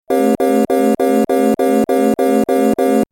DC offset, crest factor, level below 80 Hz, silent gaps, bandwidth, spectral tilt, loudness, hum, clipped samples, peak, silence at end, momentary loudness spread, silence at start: under 0.1%; 10 dB; -50 dBFS; none; 17 kHz; -6 dB/octave; -14 LUFS; none; under 0.1%; -2 dBFS; 0.1 s; 1 LU; 0.1 s